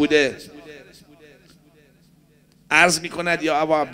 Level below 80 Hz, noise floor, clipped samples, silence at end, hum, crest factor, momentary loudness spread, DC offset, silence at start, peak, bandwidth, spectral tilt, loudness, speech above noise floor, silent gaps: -58 dBFS; -56 dBFS; under 0.1%; 0 s; none; 22 dB; 25 LU; under 0.1%; 0 s; 0 dBFS; 16 kHz; -3 dB/octave; -19 LUFS; 37 dB; none